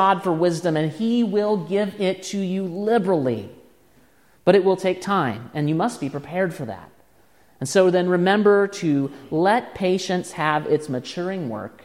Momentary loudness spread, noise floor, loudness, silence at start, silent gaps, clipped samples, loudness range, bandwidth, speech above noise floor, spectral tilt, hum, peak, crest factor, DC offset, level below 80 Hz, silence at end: 10 LU; -58 dBFS; -22 LUFS; 0 s; none; under 0.1%; 3 LU; 14 kHz; 37 dB; -6 dB/octave; none; -4 dBFS; 18 dB; 0.1%; -64 dBFS; 0.15 s